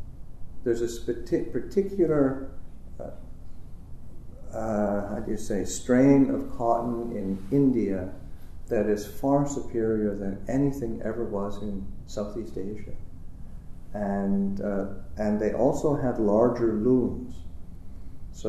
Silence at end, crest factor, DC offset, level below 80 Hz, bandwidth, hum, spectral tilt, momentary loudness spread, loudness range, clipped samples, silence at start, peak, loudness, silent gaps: 0 s; 20 dB; under 0.1%; -42 dBFS; 13.5 kHz; none; -7.5 dB/octave; 24 LU; 8 LU; under 0.1%; 0 s; -8 dBFS; -27 LUFS; none